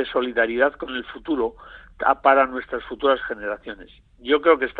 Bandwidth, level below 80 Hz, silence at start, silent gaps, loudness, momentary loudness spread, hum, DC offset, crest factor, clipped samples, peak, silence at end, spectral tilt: 4.6 kHz; -52 dBFS; 0 s; none; -22 LUFS; 14 LU; none; under 0.1%; 20 dB; under 0.1%; -2 dBFS; 0 s; -6.5 dB/octave